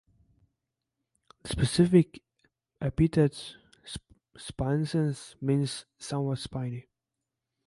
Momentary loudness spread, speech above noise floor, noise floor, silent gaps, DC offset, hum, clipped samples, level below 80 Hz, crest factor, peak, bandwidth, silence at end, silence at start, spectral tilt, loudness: 19 LU; 59 dB; -87 dBFS; none; under 0.1%; none; under 0.1%; -50 dBFS; 22 dB; -8 dBFS; 11.5 kHz; 0.85 s; 1.45 s; -6.5 dB/octave; -28 LUFS